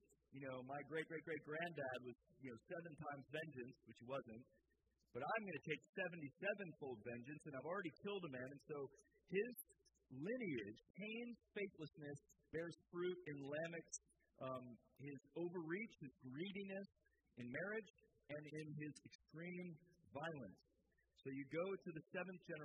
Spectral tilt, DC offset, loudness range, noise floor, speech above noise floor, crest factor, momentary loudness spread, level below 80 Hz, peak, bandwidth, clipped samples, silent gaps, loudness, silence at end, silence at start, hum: -5.5 dB/octave; under 0.1%; 4 LU; -83 dBFS; 32 dB; 20 dB; 12 LU; -86 dBFS; -32 dBFS; 8.2 kHz; under 0.1%; 5.89-5.93 s, 10.90-10.94 s, 17.90-17.94 s, 19.15-19.19 s; -51 LUFS; 0 s; 0.3 s; none